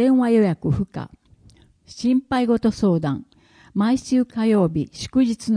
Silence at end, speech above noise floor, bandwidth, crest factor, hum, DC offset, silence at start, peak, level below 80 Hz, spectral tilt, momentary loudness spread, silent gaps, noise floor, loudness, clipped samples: 0 s; 33 dB; 10.5 kHz; 14 dB; none; under 0.1%; 0 s; -6 dBFS; -48 dBFS; -7 dB/octave; 11 LU; none; -53 dBFS; -21 LUFS; under 0.1%